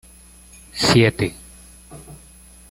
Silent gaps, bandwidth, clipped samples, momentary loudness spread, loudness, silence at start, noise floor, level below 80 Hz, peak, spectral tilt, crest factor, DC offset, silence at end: none; 16 kHz; under 0.1%; 27 LU; -18 LUFS; 0.75 s; -46 dBFS; -46 dBFS; -2 dBFS; -4.5 dB/octave; 22 dB; under 0.1%; 0.55 s